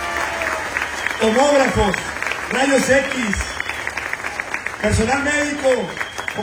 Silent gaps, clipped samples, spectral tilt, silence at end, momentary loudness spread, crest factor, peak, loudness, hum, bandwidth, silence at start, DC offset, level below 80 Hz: none; under 0.1%; -4 dB/octave; 0 s; 9 LU; 18 dB; -2 dBFS; -19 LUFS; none; 17.5 kHz; 0 s; under 0.1%; -36 dBFS